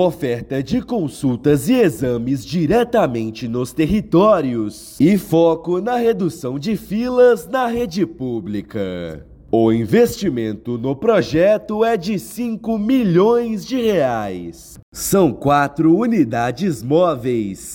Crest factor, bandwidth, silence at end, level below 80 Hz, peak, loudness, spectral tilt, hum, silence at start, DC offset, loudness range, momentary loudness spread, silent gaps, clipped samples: 14 dB; 17 kHz; 0 s; -44 dBFS; -4 dBFS; -18 LUFS; -6.5 dB/octave; none; 0 s; under 0.1%; 2 LU; 10 LU; 14.83-14.92 s; under 0.1%